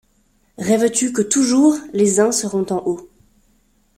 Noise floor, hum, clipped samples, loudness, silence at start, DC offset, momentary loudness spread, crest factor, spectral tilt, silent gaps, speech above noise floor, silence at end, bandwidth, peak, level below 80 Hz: -60 dBFS; none; under 0.1%; -17 LUFS; 0.6 s; under 0.1%; 9 LU; 18 dB; -4 dB/octave; none; 43 dB; 0.9 s; 16 kHz; 0 dBFS; -58 dBFS